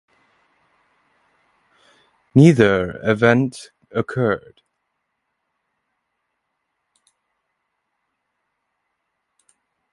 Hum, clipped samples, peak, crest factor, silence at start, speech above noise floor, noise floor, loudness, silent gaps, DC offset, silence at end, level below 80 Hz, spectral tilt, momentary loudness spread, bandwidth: none; under 0.1%; 0 dBFS; 22 dB; 2.35 s; 59 dB; -75 dBFS; -17 LUFS; none; under 0.1%; 5.55 s; -54 dBFS; -7.5 dB/octave; 15 LU; 11.5 kHz